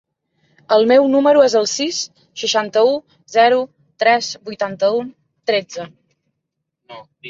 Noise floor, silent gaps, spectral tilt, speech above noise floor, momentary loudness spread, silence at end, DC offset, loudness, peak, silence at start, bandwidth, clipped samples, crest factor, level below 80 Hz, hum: -77 dBFS; none; -3 dB/octave; 61 dB; 16 LU; 0 s; under 0.1%; -16 LUFS; -2 dBFS; 0.7 s; 7.8 kHz; under 0.1%; 16 dB; -68 dBFS; none